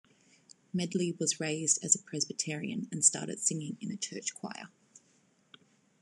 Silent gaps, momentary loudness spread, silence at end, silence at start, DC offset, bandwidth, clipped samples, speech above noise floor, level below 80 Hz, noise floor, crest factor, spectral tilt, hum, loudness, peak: none; 13 LU; 1.35 s; 0.75 s; under 0.1%; 12.5 kHz; under 0.1%; 36 dB; -84 dBFS; -69 dBFS; 26 dB; -3 dB/octave; none; -31 LUFS; -8 dBFS